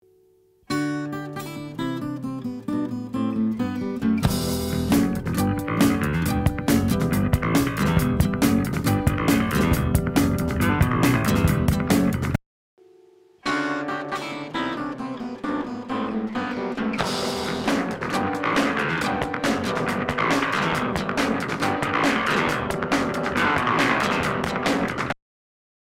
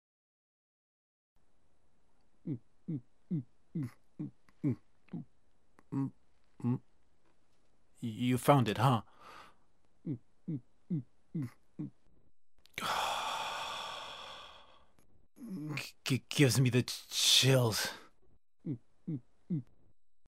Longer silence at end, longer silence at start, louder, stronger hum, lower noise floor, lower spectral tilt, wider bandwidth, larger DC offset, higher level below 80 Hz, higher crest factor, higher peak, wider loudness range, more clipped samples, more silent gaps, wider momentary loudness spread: first, 0.85 s vs 0.65 s; second, 0.7 s vs 2.45 s; first, -23 LUFS vs -34 LUFS; neither; second, -59 dBFS vs -74 dBFS; about the same, -5.5 dB/octave vs -4.5 dB/octave; about the same, 16.5 kHz vs 16 kHz; neither; first, -40 dBFS vs -72 dBFS; second, 18 dB vs 24 dB; first, -6 dBFS vs -12 dBFS; second, 7 LU vs 14 LU; neither; first, 12.46-12.77 s vs none; second, 9 LU vs 20 LU